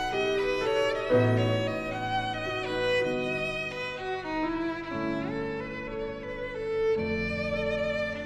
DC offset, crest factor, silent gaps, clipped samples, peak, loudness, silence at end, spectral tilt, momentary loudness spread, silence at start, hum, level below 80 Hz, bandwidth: under 0.1%; 16 dB; none; under 0.1%; -14 dBFS; -29 LUFS; 0 s; -6 dB/octave; 9 LU; 0 s; none; -48 dBFS; 12.5 kHz